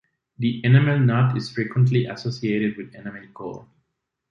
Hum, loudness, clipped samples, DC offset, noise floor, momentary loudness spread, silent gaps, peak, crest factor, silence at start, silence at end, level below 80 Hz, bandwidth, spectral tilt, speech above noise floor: none; -21 LUFS; under 0.1%; under 0.1%; -77 dBFS; 19 LU; none; -2 dBFS; 20 dB; 0.4 s; 0.7 s; -60 dBFS; 7 kHz; -8 dB/octave; 56 dB